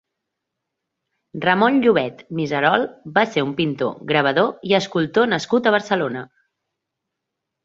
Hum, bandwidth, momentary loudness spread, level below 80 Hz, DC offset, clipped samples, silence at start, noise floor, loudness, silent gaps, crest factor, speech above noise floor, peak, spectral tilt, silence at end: none; 7.8 kHz; 9 LU; -62 dBFS; under 0.1%; under 0.1%; 1.35 s; -81 dBFS; -19 LUFS; none; 20 dB; 62 dB; -2 dBFS; -5.5 dB/octave; 1.4 s